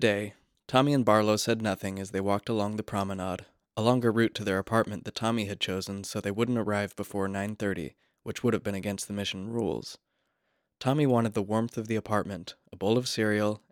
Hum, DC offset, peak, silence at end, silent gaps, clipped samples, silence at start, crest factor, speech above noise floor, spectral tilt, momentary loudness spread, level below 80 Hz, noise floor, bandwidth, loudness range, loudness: none; under 0.1%; -8 dBFS; 0.15 s; none; under 0.1%; 0 s; 22 dB; 49 dB; -5.5 dB/octave; 10 LU; -66 dBFS; -78 dBFS; 18.5 kHz; 5 LU; -29 LUFS